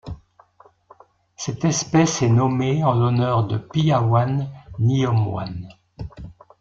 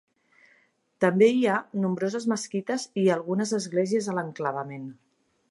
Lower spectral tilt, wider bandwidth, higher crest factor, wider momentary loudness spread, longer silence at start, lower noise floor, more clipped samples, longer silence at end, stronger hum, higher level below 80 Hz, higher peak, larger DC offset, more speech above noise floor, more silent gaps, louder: about the same, -6 dB/octave vs -5.5 dB/octave; second, 7.6 kHz vs 11.5 kHz; about the same, 16 dB vs 20 dB; first, 19 LU vs 10 LU; second, 0.05 s vs 1 s; second, -54 dBFS vs -65 dBFS; neither; second, 0.3 s vs 0.55 s; neither; first, -48 dBFS vs -76 dBFS; first, -4 dBFS vs -8 dBFS; neither; second, 35 dB vs 40 dB; neither; first, -20 LUFS vs -26 LUFS